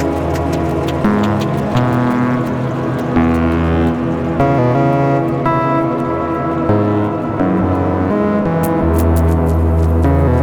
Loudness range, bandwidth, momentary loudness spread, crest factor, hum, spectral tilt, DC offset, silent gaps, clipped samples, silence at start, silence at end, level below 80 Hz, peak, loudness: 1 LU; over 20 kHz; 4 LU; 12 dB; none; -8.5 dB/octave; under 0.1%; none; under 0.1%; 0 s; 0 s; -28 dBFS; -2 dBFS; -15 LUFS